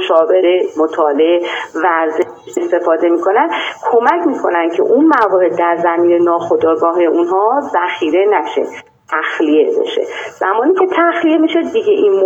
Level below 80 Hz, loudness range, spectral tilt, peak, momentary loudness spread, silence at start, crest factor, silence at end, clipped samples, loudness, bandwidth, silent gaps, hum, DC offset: -64 dBFS; 2 LU; -5 dB/octave; 0 dBFS; 7 LU; 0 s; 12 dB; 0 s; under 0.1%; -13 LUFS; 8 kHz; none; none; under 0.1%